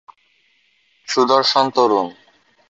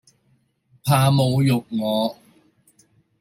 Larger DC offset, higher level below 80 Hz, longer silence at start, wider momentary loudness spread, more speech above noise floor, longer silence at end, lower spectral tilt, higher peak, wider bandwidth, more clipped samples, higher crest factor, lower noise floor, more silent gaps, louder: neither; second, -66 dBFS vs -58 dBFS; first, 1.1 s vs 0.85 s; about the same, 8 LU vs 9 LU; about the same, 45 dB vs 45 dB; second, 0.6 s vs 1.05 s; second, -3.5 dB/octave vs -6.5 dB/octave; about the same, -2 dBFS vs -4 dBFS; second, 8 kHz vs 16 kHz; neither; about the same, 18 dB vs 18 dB; second, -60 dBFS vs -64 dBFS; neither; first, -16 LUFS vs -20 LUFS